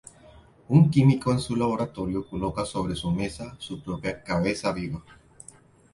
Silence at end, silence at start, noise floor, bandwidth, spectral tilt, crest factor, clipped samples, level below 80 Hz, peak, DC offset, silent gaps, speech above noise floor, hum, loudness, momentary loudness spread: 0.95 s; 0.7 s; -53 dBFS; 11.5 kHz; -7 dB/octave; 20 dB; under 0.1%; -48 dBFS; -6 dBFS; under 0.1%; none; 28 dB; none; -26 LUFS; 15 LU